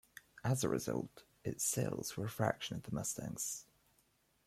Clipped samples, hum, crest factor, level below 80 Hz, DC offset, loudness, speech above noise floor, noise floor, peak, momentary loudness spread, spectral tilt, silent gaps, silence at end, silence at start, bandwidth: under 0.1%; none; 22 dB; -68 dBFS; under 0.1%; -39 LUFS; 36 dB; -75 dBFS; -18 dBFS; 10 LU; -4.5 dB/octave; none; 0.85 s; 0.35 s; 16 kHz